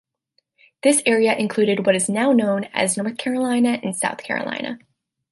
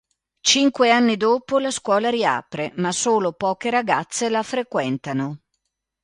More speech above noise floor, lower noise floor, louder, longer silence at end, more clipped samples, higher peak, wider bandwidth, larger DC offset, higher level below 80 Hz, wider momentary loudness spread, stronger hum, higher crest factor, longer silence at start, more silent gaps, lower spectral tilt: second, 50 dB vs 56 dB; second, -69 dBFS vs -76 dBFS; about the same, -20 LUFS vs -20 LUFS; about the same, 0.55 s vs 0.65 s; neither; about the same, -4 dBFS vs -2 dBFS; about the same, 12 kHz vs 11.5 kHz; neither; second, -70 dBFS vs -64 dBFS; about the same, 8 LU vs 9 LU; neither; about the same, 18 dB vs 20 dB; first, 0.85 s vs 0.45 s; neither; about the same, -3.5 dB/octave vs -3.5 dB/octave